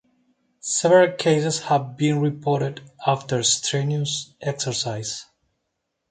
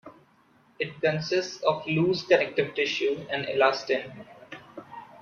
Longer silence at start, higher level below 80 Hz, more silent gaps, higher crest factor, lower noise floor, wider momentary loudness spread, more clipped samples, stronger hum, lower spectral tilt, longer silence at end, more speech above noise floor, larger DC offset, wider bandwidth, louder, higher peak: first, 0.65 s vs 0.05 s; about the same, -64 dBFS vs -68 dBFS; neither; about the same, 20 dB vs 20 dB; first, -77 dBFS vs -61 dBFS; second, 13 LU vs 21 LU; neither; neither; about the same, -4 dB/octave vs -5 dB/octave; first, 0.85 s vs 0.05 s; first, 56 dB vs 35 dB; neither; first, 9.6 kHz vs 7.2 kHz; first, -22 LUFS vs -26 LUFS; first, -4 dBFS vs -8 dBFS